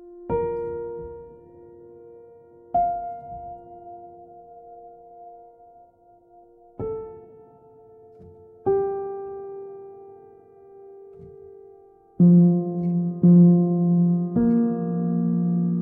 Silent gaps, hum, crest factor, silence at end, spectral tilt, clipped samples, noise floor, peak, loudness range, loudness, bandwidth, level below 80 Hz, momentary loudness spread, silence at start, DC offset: none; none; 18 dB; 0 s; -15 dB/octave; under 0.1%; -55 dBFS; -6 dBFS; 21 LU; -21 LUFS; 1.7 kHz; -56 dBFS; 27 LU; 0 s; under 0.1%